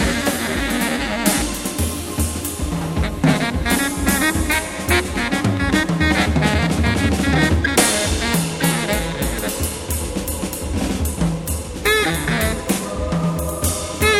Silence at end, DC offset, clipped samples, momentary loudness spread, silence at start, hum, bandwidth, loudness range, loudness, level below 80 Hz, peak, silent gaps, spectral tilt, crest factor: 0 s; under 0.1%; under 0.1%; 7 LU; 0 s; none; 17 kHz; 4 LU; -19 LUFS; -28 dBFS; 0 dBFS; none; -4 dB/octave; 18 dB